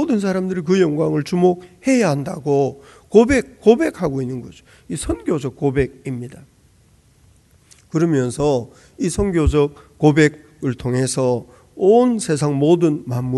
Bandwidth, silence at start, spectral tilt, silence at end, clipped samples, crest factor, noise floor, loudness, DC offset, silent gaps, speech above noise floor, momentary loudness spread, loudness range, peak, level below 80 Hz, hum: 12 kHz; 0 s; -6.5 dB/octave; 0 s; under 0.1%; 18 dB; -53 dBFS; -18 LUFS; under 0.1%; none; 36 dB; 11 LU; 7 LU; 0 dBFS; -36 dBFS; none